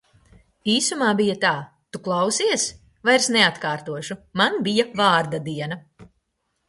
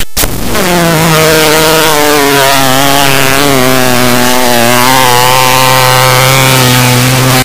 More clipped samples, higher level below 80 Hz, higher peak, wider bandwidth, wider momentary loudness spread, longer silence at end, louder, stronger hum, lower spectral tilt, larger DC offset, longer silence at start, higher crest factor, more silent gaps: second, under 0.1% vs 3%; second, -62 dBFS vs -28 dBFS; about the same, -2 dBFS vs 0 dBFS; second, 11.5 kHz vs over 20 kHz; first, 13 LU vs 2 LU; first, 0.65 s vs 0 s; second, -21 LUFS vs -5 LUFS; neither; about the same, -3 dB/octave vs -3.5 dB/octave; second, under 0.1% vs 10%; first, 0.65 s vs 0 s; first, 20 dB vs 8 dB; neither